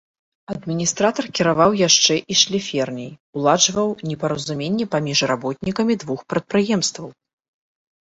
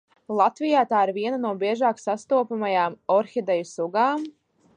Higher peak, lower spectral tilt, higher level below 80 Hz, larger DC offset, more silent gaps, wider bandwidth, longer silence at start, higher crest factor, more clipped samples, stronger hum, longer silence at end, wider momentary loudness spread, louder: first, -2 dBFS vs -6 dBFS; second, -3 dB/octave vs -5.5 dB/octave; first, -56 dBFS vs -78 dBFS; neither; first, 3.20-3.33 s vs none; second, 8.4 kHz vs 9.8 kHz; first, 0.5 s vs 0.3 s; about the same, 20 dB vs 18 dB; neither; neither; first, 1 s vs 0.45 s; first, 12 LU vs 6 LU; first, -19 LUFS vs -24 LUFS